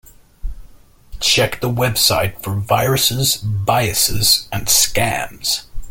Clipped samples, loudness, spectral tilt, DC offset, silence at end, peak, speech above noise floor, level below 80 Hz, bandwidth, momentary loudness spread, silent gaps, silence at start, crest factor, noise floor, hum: under 0.1%; -16 LUFS; -2.5 dB/octave; under 0.1%; 0 s; 0 dBFS; 26 dB; -34 dBFS; 17 kHz; 9 LU; none; 0.45 s; 18 dB; -42 dBFS; none